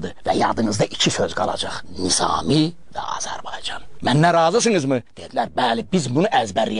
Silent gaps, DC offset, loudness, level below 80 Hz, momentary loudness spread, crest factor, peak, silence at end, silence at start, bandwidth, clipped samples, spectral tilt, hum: none; 2%; -20 LUFS; -48 dBFS; 12 LU; 18 dB; -2 dBFS; 0 s; 0 s; 11 kHz; under 0.1%; -4 dB/octave; none